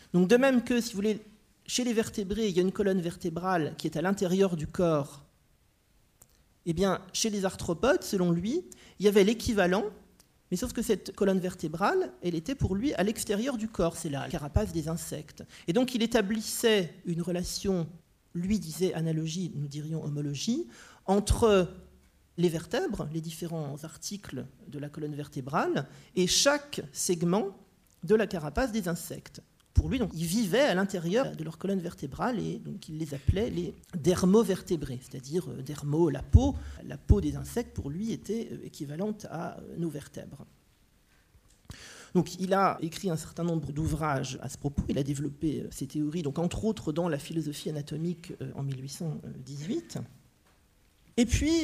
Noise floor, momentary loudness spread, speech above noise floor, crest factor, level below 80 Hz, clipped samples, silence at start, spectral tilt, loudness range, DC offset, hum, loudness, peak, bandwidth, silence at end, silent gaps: -67 dBFS; 14 LU; 37 dB; 24 dB; -44 dBFS; under 0.1%; 0.15 s; -5.5 dB/octave; 7 LU; under 0.1%; none; -30 LUFS; -6 dBFS; 15.5 kHz; 0 s; none